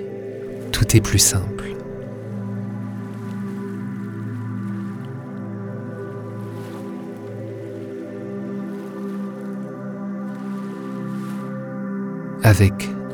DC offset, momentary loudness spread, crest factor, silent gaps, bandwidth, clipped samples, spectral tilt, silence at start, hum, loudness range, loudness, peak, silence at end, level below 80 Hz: under 0.1%; 15 LU; 24 dB; none; 19.5 kHz; under 0.1%; -4.5 dB/octave; 0 s; none; 10 LU; -25 LUFS; 0 dBFS; 0 s; -42 dBFS